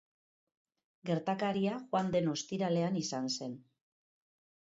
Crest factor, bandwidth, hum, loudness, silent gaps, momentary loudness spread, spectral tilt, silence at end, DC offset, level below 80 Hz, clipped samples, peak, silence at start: 18 dB; 7.6 kHz; none; -34 LUFS; none; 8 LU; -5.5 dB/octave; 1.1 s; under 0.1%; -74 dBFS; under 0.1%; -20 dBFS; 1.05 s